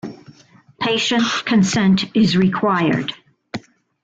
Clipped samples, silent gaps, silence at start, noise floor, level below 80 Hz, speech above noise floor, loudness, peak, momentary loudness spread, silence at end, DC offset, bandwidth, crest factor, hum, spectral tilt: under 0.1%; none; 0.05 s; -49 dBFS; -54 dBFS; 33 dB; -17 LUFS; -6 dBFS; 18 LU; 0.45 s; under 0.1%; 7.8 kHz; 12 dB; none; -5 dB/octave